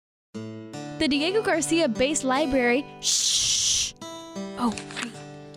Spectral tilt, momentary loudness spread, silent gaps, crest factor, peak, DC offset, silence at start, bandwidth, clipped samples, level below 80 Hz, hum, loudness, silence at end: -2 dB/octave; 18 LU; none; 14 dB; -12 dBFS; under 0.1%; 0.35 s; 19 kHz; under 0.1%; -52 dBFS; none; -23 LUFS; 0 s